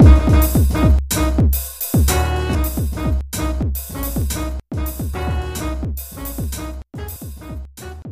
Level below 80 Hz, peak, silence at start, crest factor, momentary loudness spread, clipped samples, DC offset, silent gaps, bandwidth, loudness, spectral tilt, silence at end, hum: -20 dBFS; 0 dBFS; 0 s; 18 dB; 16 LU; under 0.1%; under 0.1%; none; 15.5 kHz; -19 LUFS; -6 dB/octave; 0 s; none